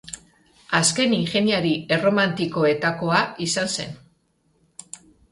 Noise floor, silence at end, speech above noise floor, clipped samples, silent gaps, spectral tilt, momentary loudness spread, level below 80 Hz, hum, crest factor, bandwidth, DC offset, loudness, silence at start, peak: -65 dBFS; 0.35 s; 44 dB; under 0.1%; none; -3.5 dB/octave; 20 LU; -60 dBFS; none; 18 dB; 11.5 kHz; under 0.1%; -21 LUFS; 0.05 s; -4 dBFS